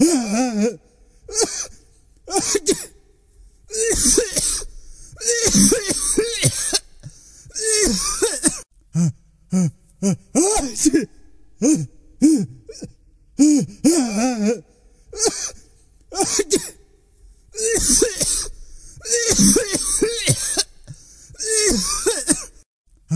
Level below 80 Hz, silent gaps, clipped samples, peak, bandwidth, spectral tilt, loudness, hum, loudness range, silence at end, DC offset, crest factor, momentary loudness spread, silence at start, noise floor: -40 dBFS; 22.66-22.85 s; under 0.1%; 0 dBFS; 11 kHz; -3 dB/octave; -18 LUFS; none; 4 LU; 0 s; under 0.1%; 20 dB; 15 LU; 0 s; -51 dBFS